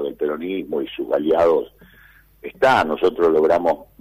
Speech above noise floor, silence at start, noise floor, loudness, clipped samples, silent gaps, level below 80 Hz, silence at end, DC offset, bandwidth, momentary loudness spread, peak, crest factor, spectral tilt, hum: 32 dB; 0 s; -50 dBFS; -19 LUFS; under 0.1%; none; -52 dBFS; 0.15 s; under 0.1%; 15.5 kHz; 10 LU; -8 dBFS; 12 dB; -6 dB/octave; none